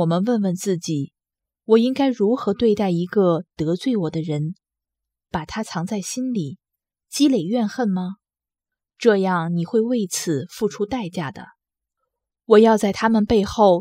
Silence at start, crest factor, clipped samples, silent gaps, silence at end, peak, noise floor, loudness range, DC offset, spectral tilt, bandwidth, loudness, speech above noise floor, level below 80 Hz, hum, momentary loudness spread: 0 s; 20 dB; under 0.1%; none; 0 s; -2 dBFS; -90 dBFS; 5 LU; under 0.1%; -6 dB/octave; 16 kHz; -21 LUFS; 70 dB; -52 dBFS; none; 12 LU